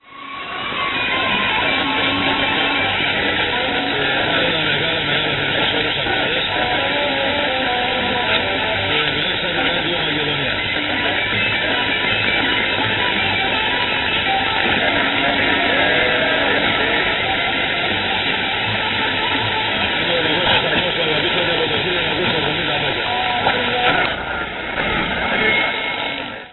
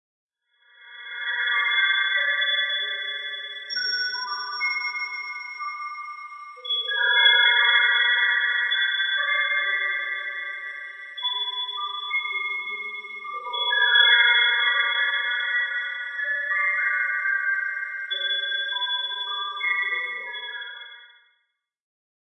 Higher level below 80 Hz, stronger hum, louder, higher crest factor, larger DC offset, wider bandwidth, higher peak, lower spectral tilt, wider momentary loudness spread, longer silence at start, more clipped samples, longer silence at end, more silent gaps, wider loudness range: first, -42 dBFS vs under -90 dBFS; neither; first, -17 LUFS vs -22 LUFS; about the same, 16 dB vs 20 dB; neither; second, 4.4 kHz vs 8.4 kHz; first, -2 dBFS vs -6 dBFS; first, -9 dB/octave vs 3 dB/octave; second, 3 LU vs 16 LU; second, 0.1 s vs 0.8 s; neither; second, 0 s vs 1.15 s; neither; second, 2 LU vs 9 LU